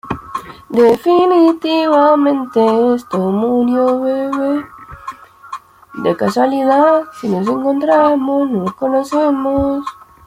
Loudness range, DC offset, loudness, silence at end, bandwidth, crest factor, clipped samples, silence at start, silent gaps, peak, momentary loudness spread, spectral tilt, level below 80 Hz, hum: 5 LU; under 0.1%; -14 LUFS; 0.35 s; 16 kHz; 12 dB; under 0.1%; 0.05 s; none; -2 dBFS; 19 LU; -7 dB/octave; -46 dBFS; none